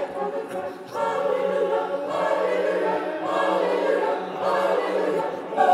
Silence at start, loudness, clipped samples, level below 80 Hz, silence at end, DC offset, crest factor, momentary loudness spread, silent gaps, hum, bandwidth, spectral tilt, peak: 0 s; -24 LUFS; under 0.1%; -74 dBFS; 0 s; under 0.1%; 18 dB; 6 LU; none; none; 13.5 kHz; -5 dB/octave; -6 dBFS